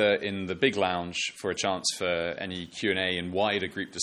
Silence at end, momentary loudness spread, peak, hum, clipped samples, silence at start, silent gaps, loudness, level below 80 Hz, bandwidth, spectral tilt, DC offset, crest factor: 0 s; 7 LU; -8 dBFS; none; under 0.1%; 0 s; none; -28 LUFS; -62 dBFS; 12.5 kHz; -3 dB/octave; under 0.1%; 20 dB